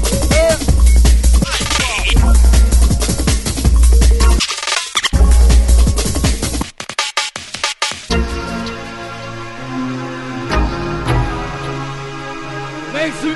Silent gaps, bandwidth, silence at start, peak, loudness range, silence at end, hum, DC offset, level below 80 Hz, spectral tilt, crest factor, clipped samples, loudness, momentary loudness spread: none; 12 kHz; 0 s; 0 dBFS; 8 LU; 0 s; none; under 0.1%; -14 dBFS; -4 dB/octave; 12 dB; under 0.1%; -15 LUFS; 14 LU